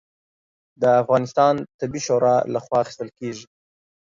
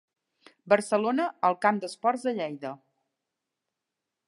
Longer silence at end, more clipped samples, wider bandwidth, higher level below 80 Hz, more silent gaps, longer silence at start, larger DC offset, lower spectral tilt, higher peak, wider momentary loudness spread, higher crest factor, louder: second, 0.7 s vs 1.55 s; neither; second, 7.6 kHz vs 11.5 kHz; first, -62 dBFS vs -84 dBFS; first, 1.74-1.79 s vs none; first, 0.8 s vs 0.65 s; neither; about the same, -5.5 dB/octave vs -5 dB/octave; about the same, -4 dBFS vs -6 dBFS; about the same, 14 LU vs 13 LU; second, 18 dB vs 24 dB; first, -20 LUFS vs -27 LUFS